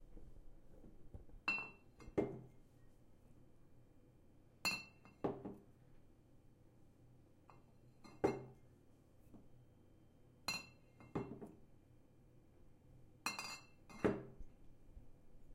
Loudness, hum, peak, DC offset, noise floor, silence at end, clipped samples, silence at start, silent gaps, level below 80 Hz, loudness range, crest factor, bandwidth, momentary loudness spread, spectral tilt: -45 LUFS; none; -22 dBFS; under 0.1%; -67 dBFS; 0 s; under 0.1%; 0 s; none; -66 dBFS; 4 LU; 28 dB; 16 kHz; 27 LU; -4 dB/octave